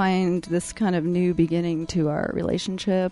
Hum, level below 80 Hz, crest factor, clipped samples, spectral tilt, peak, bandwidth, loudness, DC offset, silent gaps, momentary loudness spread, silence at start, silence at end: none; -48 dBFS; 14 dB; under 0.1%; -6.5 dB/octave; -10 dBFS; 11.5 kHz; -24 LUFS; under 0.1%; none; 4 LU; 0 s; 0 s